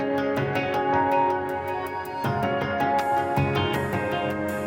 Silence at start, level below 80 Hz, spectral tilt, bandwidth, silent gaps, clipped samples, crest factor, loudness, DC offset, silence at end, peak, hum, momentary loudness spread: 0 s; -52 dBFS; -6.5 dB/octave; 17 kHz; none; under 0.1%; 14 dB; -25 LUFS; under 0.1%; 0 s; -10 dBFS; none; 7 LU